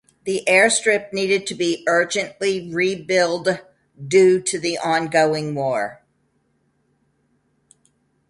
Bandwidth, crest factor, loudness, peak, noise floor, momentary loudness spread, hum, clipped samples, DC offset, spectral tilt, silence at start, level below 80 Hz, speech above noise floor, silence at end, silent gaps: 11.5 kHz; 20 dB; -19 LUFS; -2 dBFS; -66 dBFS; 9 LU; none; under 0.1%; under 0.1%; -3.5 dB/octave; 0.25 s; -64 dBFS; 47 dB; 2.35 s; none